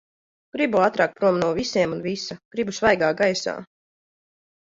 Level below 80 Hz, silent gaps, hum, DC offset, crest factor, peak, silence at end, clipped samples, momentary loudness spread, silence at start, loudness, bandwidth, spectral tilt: -56 dBFS; 2.45-2.51 s; none; under 0.1%; 20 dB; -4 dBFS; 1.15 s; under 0.1%; 11 LU; 0.55 s; -22 LUFS; 7.8 kHz; -4.5 dB/octave